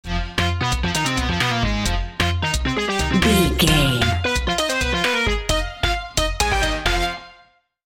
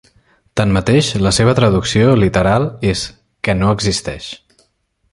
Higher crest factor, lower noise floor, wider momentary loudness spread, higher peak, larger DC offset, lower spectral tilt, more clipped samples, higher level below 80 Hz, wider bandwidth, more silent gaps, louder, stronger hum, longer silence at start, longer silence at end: about the same, 18 dB vs 14 dB; second, -55 dBFS vs -63 dBFS; second, 7 LU vs 14 LU; about the same, -2 dBFS vs -2 dBFS; neither; second, -4 dB/octave vs -5.5 dB/octave; neither; first, -28 dBFS vs -34 dBFS; first, 17 kHz vs 11.5 kHz; neither; second, -20 LUFS vs -14 LUFS; neither; second, 0.05 s vs 0.55 s; second, 0.55 s vs 0.75 s